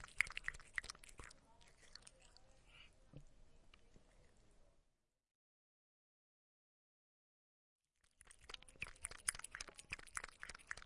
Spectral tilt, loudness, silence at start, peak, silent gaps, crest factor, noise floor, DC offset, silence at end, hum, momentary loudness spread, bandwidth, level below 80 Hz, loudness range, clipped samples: 0 dB/octave; -48 LUFS; 0 s; -16 dBFS; 5.31-7.79 s; 38 dB; -84 dBFS; under 0.1%; 0 s; none; 24 LU; 11.5 kHz; -68 dBFS; 19 LU; under 0.1%